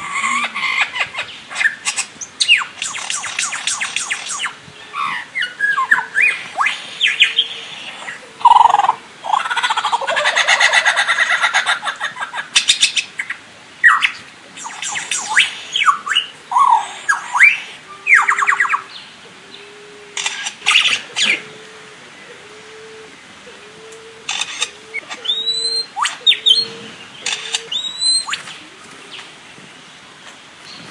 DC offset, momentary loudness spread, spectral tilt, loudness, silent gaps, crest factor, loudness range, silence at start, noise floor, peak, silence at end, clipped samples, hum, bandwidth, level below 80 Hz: under 0.1%; 23 LU; 1.5 dB/octave; -15 LUFS; none; 18 dB; 8 LU; 0 s; -40 dBFS; 0 dBFS; 0 s; under 0.1%; none; 12 kHz; -66 dBFS